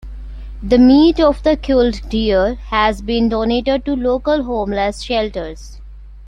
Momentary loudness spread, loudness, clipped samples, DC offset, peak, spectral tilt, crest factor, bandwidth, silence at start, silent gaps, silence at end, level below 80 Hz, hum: 18 LU; -15 LUFS; under 0.1%; under 0.1%; -2 dBFS; -6 dB/octave; 14 dB; 10.5 kHz; 0.05 s; none; 0 s; -30 dBFS; none